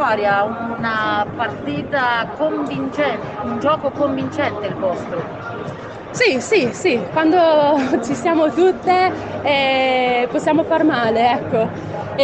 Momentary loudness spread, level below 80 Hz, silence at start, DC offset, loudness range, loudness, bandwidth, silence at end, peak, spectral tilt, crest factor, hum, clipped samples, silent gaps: 10 LU; -52 dBFS; 0 s; under 0.1%; 5 LU; -18 LUFS; 8.8 kHz; 0 s; -2 dBFS; -5 dB/octave; 16 dB; none; under 0.1%; none